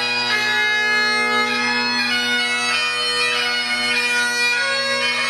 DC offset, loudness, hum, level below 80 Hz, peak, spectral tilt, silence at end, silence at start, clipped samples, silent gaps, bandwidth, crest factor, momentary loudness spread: under 0.1%; -17 LUFS; none; -66 dBFS; -6 dBFS; -0.5 dB/octave; 0 s; 0 s; under 0.1%; none; 14 kHz; 14 dB; 2 LU